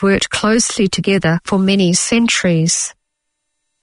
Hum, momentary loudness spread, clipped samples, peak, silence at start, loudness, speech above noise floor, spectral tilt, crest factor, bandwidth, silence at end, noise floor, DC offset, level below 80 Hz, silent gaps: none; 3 LU; under 0.1%; -2 dBFS; 0 s; -14 LUFS; 59 dB; -4 dB/octave; 14 dB; 11 kHz; 0.9 s; -73 dBFS; under 0.1%; -44 dBFS; none